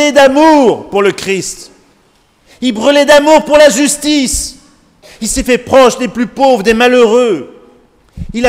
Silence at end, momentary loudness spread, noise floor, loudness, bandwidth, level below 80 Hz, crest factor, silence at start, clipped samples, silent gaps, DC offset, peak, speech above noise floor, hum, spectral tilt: 0 s; 13 LU; -50 dBFS; -9 LUFS; 16.5 kHz; -34 dBFS; 10 dB; 0 s; 2%; none; under 0.1%; 0 dBFS; 42 dB; none; -3 dB/octave